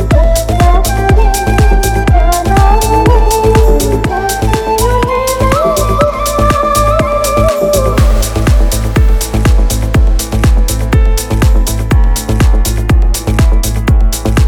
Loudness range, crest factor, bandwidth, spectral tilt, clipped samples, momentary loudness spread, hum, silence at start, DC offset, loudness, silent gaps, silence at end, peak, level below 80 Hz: 2 LU; 8 dB; 17.5 kHz; -5.5 dB/octave; 0.2%; 3 LU; none; 0 s; under 0.1%; -11 LUFS; none; 0 s; 0 dBFS; -10 dBFS